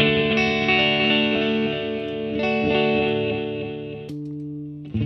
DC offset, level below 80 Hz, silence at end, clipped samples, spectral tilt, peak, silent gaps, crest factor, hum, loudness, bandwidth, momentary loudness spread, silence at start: under 0.1%; -50 dBFS; 0 s; under 0.1%; -6.5 dB/octave; -4 dBFS; none; 18 dB; 50 Hz at -50 dBFS; -21 LUFS; 6.4 kHz; 15 LU; 0 s